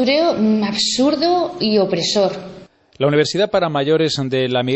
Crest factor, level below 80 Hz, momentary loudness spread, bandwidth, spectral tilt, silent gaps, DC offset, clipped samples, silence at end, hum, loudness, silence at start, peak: 14 dB; -54 dBFS; 3 LU; 8.4 kHz; -4.5 dB/octave; none; under 0.1%; under 0.1%; 0 s; none; -17 LUFS; 0 s; -2 dBFS